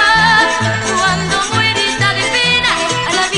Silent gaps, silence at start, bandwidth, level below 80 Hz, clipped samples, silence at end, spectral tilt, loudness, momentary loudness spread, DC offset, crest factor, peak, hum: none; 0 s; 11 kHz; -40 dBFS; under 0.1%; 0 s; -2.5 dB/octave; -12 LUFS; 5 LU; under 0.1%; 14 dB; 0 dBFS; none